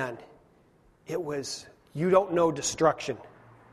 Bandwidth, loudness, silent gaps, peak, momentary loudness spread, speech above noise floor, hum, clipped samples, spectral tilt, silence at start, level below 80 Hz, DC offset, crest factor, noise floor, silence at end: 13.5 kHz; -28 LUFS; none; -8 dBFS; 16 LU; 34 dB; none; under 0.1%; -4.5 dB/octave; 0 s; -62 dBFS; under 0.1%; 20 dB; -62 dBFS; 0.45 s